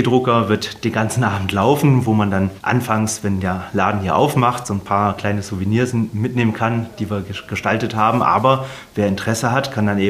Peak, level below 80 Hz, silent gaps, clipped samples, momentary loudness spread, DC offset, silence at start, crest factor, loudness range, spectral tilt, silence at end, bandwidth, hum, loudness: 0 dBFS; -50 dBFS; none; under 0.1%; 7 LU; under 0.1%; 0 s; 18 dB; 2 LU; -6 dB/octave; 0 s; 15.5 kHz; none; -18 LUFS